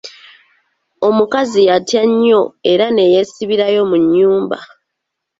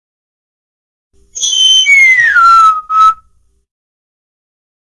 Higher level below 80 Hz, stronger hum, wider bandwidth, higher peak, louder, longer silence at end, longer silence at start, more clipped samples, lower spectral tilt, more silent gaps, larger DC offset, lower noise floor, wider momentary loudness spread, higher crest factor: second, -58 dBFS vs -50 dBFS; neither; second, 8 kHz vs 12 kHz; about the same, -2 dBFS vs 0 dBFS; second, -13 LUFS vs -6 LUFS; second, 0.75 s vs 1.85 s; second, 0.05 s vs 1.35 s; neither; first, -5 dB/octave vs 4.5 dB/octave; neither; neither; first, -76 dBFS vs -52 dBFS; second, 6 LU vs 12 LU; about the same, 12 dB vs 12 dB